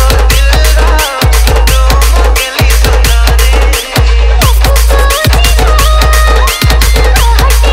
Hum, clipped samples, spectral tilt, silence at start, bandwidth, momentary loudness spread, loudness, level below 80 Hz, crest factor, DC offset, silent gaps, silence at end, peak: none; 0.4%; -3.5 dB/octave; 0 s; 16.5 kHz; 2 LU; -8 LUFS; -6 dBFS; 6 dB; under 0.1%; none; 0 s; 0 dBFS